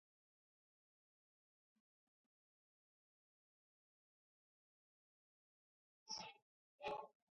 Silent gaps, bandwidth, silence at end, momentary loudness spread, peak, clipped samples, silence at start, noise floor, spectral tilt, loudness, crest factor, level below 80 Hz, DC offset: 6.42-6.79 s; 6 kHz; 0.2 s; 4 LU; -36 dBFS; under 0.1%; 6.05 s; under -90 dBFS; -0.5 dB/octave; -52 LUFS; 26 dB; under -90 dBFS; under 0.1%